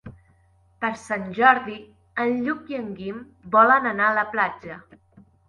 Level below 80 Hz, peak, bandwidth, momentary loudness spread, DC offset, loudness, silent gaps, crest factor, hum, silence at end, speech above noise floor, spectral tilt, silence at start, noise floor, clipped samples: -60 dBFS; -2 dBFS; 11.5 kHz; 21 LU; under 0.1%; -21 LUFS; none; 22 dB; none; 0.7 s; 37 dB; -5.5 dB/octave; 0.05 s; -59 dBFS; under 0.1%